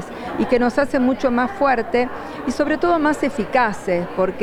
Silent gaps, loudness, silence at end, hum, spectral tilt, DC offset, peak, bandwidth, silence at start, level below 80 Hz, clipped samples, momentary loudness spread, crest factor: none; -19 LUFS; 0 s; none; -6 dB/octave; under 0.1%; -4 dBFS; 18.5 kHz; 0 s; -44 dBFS; under 0.1%; 7 LU; 16 dB